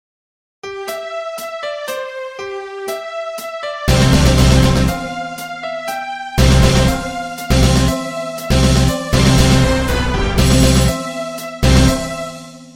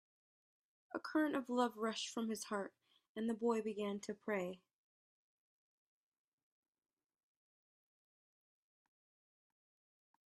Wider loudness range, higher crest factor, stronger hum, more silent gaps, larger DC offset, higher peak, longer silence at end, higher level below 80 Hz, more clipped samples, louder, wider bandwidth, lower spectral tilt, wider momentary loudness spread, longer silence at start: about the same, 9 LU vs 9 LU; second, 14 dB vs 24 dB; neither; second, none vs 3.09-3.15 s; neither; first, 0 dBFS vs -22 dBFS; second, 0.05 s vs 5.75 s; first, -20 dBFS vs -90 dBFS; neither; first, -15 LUFS vs -41 LUFS; first, 16.5 kHz vs 13 kHz; about the same, -5 dB/octave vs -4 dB/octave; first, 14 LU vs 11 LU; second, 0.65 s vs 0.95 s